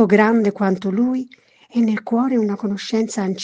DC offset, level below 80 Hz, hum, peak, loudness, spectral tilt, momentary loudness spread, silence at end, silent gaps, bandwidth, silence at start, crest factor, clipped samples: under 0.1%; -66 dBFS; none; 0 dBFS; -19 LUFS; -6.5 dB/octave; 9 LU; 0 s; none; 9.6 kHz; 0 s; 18 dB; under 0.1%